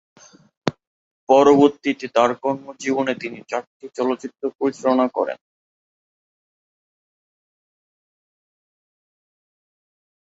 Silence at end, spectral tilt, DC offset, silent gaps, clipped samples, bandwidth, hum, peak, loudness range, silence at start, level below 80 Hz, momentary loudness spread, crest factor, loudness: 4.9 s; -5.5 dB/octave; under 0.1%; 0.87-1.27 s, 3.67-3.80 s, 4.55-4.59 s; under 0.1%; 8 kHz; none; -2 dBFS; 8 LU; 0.65 s; -66 dBFS; 15 LU; 22 dB; -20 LUFS